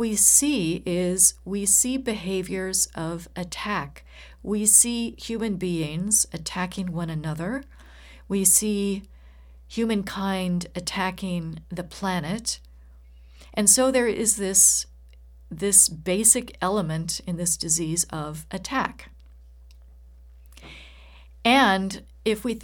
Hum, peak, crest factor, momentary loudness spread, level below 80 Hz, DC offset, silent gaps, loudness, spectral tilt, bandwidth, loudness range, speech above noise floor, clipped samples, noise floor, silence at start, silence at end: none; -4 dBFS; 22 dB; 16 LU; -48 dBFS; under 0.1%; none; -22 LUFS; -2.5 dB/octave; 19 kHz; 9 LU; 24 dB; under 0.1%; -48 dBFS; 0 s; 0 s